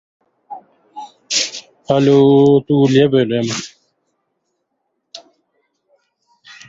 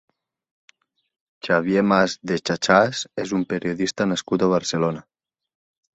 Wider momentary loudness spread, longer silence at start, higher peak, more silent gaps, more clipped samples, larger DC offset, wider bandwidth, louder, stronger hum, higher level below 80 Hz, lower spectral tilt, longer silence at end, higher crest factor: first, 26 LU vs 8 LU; second, 0.5 s vs 1.45 s; about the same, -2 dBFS vs -2 dBFS; neither; neither; neither; about the same, 7.8 kHz vs 8.2 kHz; first, -14 LUFS vs -21 LUFS; neither; about the same, -56 dBFS vs -58 dBFS; about the same, -5.5 dB/octave vs -5 dB/octave; first, 1.5 s vs 0.95 s; about the same, 16 dB vs 20 dB